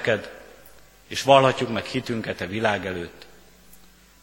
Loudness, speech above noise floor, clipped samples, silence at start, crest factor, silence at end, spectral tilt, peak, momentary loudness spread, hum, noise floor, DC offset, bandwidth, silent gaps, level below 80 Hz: -23 LUFS; 29 dB; under 0.1%; 0 s; 24 dB; 0.45 s; -5 dB/octave; -2 dBFS; 19 LU; none; -52 dBFS; under 0.1%; 17 kHz; none; -56 dBFS